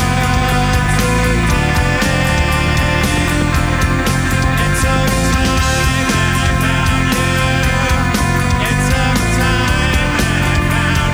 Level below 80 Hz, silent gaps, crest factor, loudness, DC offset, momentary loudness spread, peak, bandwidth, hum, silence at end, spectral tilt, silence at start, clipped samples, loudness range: -20 dBFS; none; 12 dB; -14 LUFS; under 0.1%; 1 LU; -2 dBFS; over 20 kHz; none; 0 s; -4.5 dB/octave; 0 s; under 0.1%; 0 LU